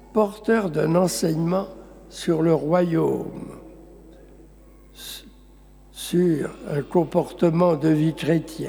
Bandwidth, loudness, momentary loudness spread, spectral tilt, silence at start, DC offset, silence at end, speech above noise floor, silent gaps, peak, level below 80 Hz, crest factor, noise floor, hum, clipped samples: over 20 kHz; -22 LUFS; 17 LU; -6.5 dB/octave; 0.15 s; under 0.1%; 0 s; 27 dB; none; -6 dBFS; -50 dBFS; 16 dB; -49 dBFS; none; under 0.1%